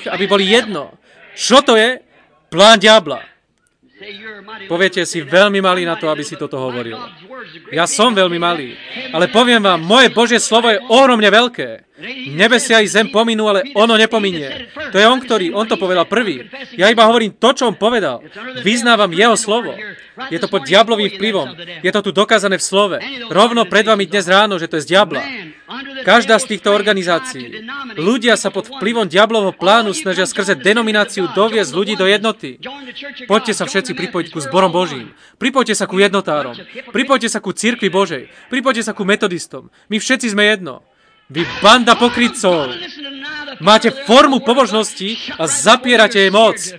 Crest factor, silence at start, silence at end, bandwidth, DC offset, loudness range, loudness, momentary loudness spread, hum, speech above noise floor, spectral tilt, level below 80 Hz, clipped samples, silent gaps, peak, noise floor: 14 dB; 0 s; 0 s; 11 kHz; under 0.1%; 5 LU; -13 LUFS; 17 LU; none; 46 dB; -3 dB/octave; -56 dBFS; 0.2%; none; 0 dBFS; -60 dBFS